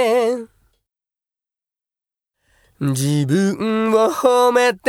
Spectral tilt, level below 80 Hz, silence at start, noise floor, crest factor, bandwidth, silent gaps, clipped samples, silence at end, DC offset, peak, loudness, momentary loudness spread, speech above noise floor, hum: -5.5 dB/octave; -62 dBFS; 0 s; under -90 dBFS; 18 dB; 17 kHz; none; under 0.1%; 0 s; under 0.1%; 0 dBFS; -17 LUFS; 8 LU; over 74 dB; none